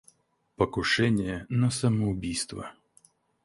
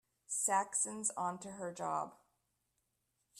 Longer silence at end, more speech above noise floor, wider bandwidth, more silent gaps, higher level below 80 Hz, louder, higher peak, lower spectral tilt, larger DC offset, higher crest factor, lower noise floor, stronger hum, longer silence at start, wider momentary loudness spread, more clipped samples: first, 0.75 s vs 0 s; second, 37 dB vs 45 dB; second, 11.5 kHz vs 14.5 kHz; neither; first, -50 dBFS vs -84 dBFS; first, -27 LUFS vs -37 LUFS; first, -10 dBFS vs -20 dBFS; first, -5 dB/octave vs -2.5 dB/octave; neither; about the same, 20 dB vs 20 dB; second, -63 dBFS vs -83 dBFS; neither; first, 0.6 s vs 0.3 s; about the same, 10 LU vs 11 LU; neither